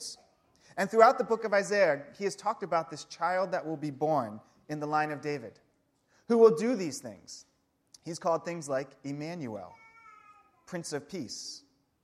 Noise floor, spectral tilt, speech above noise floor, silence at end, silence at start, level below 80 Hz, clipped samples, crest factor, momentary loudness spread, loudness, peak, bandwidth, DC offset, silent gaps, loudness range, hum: -72 dBFS; -5 dB/octave; 42 dB; 0.45 s; 0 s; -78 dBFS; under 0.1%; 24 dB; 21 LU; -30 LUFS; -6 dBFS; 13.5 kHz; under 0.1%; none; 9 LU; none